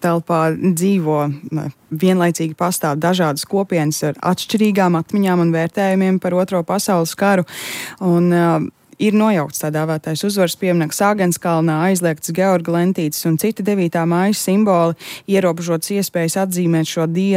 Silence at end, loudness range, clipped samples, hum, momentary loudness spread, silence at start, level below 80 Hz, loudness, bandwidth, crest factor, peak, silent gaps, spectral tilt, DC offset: 0 s; 1 LU; under 0.1%; none; 5 LU; 0 s; -64 dBFS; -17 LUFS; 16.5 kHz; 12 dB; -4 dBFS; none; -5.5 dB/octave; under 0.1%